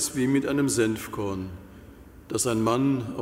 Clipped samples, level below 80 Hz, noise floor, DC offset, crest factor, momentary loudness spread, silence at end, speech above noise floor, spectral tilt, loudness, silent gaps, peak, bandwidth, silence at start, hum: under 0.1%; -52 dBFS; -47 dBFS; under 0.1%; 16 dB; 11 LU; 0 s; 22 dB; -5 dB/octave; -26 LUFS; none; -10 dBFS; 16 kHz; 0 s; none